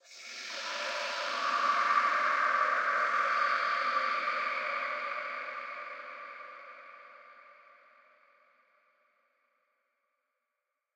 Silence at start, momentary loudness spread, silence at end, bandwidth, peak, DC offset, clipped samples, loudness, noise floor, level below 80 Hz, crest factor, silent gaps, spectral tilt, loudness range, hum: 0.1 s; 18 LU; 3.45 s; 15.5 kHz; -14 dBFS; under 0.1%; under 0.1%; -30 LUFS; -86 dBFS; under -90 dBFS; 20 dB; none; 0.5 dB/octave; 19 LU; none